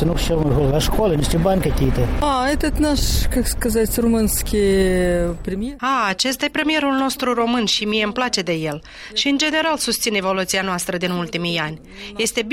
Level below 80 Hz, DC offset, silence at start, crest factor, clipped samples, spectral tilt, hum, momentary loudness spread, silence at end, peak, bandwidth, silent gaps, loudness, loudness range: -28 dBFS; under 0.1%; 0 s; 16 dB; under 0.1%; -4 dB/octave; none; 6 LU; 0 s; -4 dBFS; 16.5 kHz; none; -19 LUFS; 1 LU